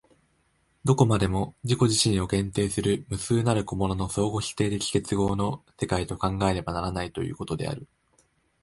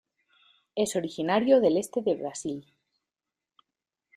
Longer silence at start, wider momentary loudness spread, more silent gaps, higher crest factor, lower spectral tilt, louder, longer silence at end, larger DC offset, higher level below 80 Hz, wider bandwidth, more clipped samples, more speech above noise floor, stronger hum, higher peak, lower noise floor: about the same, 0.85 s vs 0.75 s; second, 10 LU vs 15 LU; neither; about the same, 20 dB vs 20 dB; about the same, -5.5 dB/octave vs -5 dB/octave; about the same, -26 LUFS vs -27 LUFS; second, 0.75 s vs 1.55 s; neither; first, -44 dBFS vs -72 dBFS; second, 11.5 kHz vs 15.5 kHz; neither; second, 42 dB vs 64 dB; neither; first, -6 dBFS vs -10 dBFS; second, -68 dBFS vs -90 dBFS